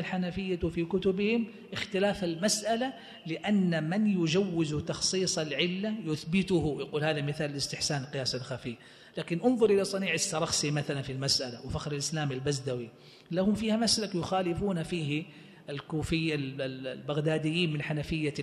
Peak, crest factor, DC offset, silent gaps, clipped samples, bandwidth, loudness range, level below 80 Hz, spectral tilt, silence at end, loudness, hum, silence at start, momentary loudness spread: -12 dBFS; 18 dB; under 0.1%; none; under 0.1%; 13 kHz; 3 LU; -54 dBFS; -4.5 dB/octave; 0 s; -30 LUFS; none; 0 s; 9 LU